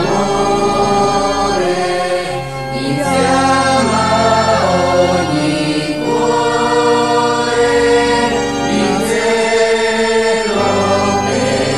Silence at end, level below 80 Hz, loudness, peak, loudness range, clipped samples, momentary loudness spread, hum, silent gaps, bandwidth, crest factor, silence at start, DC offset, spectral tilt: 0 s; -38 dBFS; -13 LUFS; 0 dBFS; 1 LU; under 0.1%; 5 LU; none; none; 13.5 kHz; 12 dB; 0 s; under 0.1%; -4.5 dB/octave